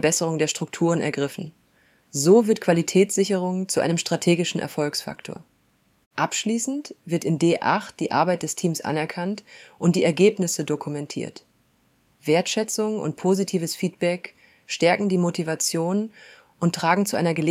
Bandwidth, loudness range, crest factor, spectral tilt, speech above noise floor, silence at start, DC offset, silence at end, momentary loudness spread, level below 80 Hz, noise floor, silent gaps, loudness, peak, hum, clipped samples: 16 kHz; 4 LU; 20 dB; -4.5 dB/octave; 41 dB; 0 s; under 0.1%; 0 s; 13 LU; -68 dBFS; -64 dBFS; 6.06-6.11 s; -23 LUFS; -4 dBFS; none; under 0.1%